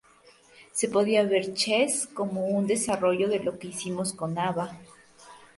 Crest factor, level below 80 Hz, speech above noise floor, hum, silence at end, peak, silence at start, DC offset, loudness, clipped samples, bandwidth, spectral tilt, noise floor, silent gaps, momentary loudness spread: 18 dB; -68 dBFS; 31 dB; none; 0.1 s; -10 dBFS; 0.6 s; under 0.1%; -27 LUFS; under 0.1%; 12 kHz; -4 dB/octave; -57 dBFS; none; 10 LU